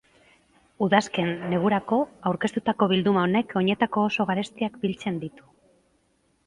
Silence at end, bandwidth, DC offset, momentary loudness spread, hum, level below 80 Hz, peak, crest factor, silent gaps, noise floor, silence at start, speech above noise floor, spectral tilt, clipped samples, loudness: 1.05 s; 11 kHz; under 0.1%; 8 LU; none; -62 dBFS; -2 dBFS; 24 dB; none; -68 dBFS; 0.8 s; 43 dB; -6 dB/octave; under 0.1%; -25 LUFS